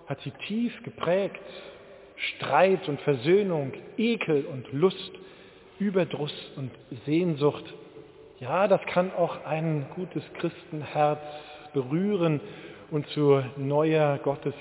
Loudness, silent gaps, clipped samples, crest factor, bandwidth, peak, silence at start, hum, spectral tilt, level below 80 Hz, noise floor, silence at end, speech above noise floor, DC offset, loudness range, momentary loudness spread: -27 LUFS; none; under 0.1%; 20 dB; 4 kHz; -8 dBFS; 0.05 s; none; -11 dB/octave; -68 dBFS; -49 dBFS; 0 s; 22 dB; under 0.1%; 4 LU; 17 LU